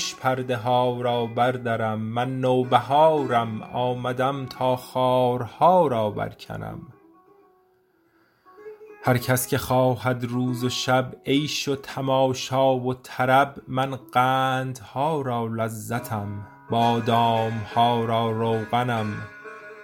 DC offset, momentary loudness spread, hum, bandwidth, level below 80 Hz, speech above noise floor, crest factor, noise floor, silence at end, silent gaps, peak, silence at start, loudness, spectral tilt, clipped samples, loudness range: under 0.1%; 11 LU; none; 17 kHz; -60 dBFS; 40 dB; 20 dB; -63 dBFS; 0 s; none; -4 dBFS; 0 s; -23 LUFS; -5.5 dB/octave; under 0.1%; 4 LU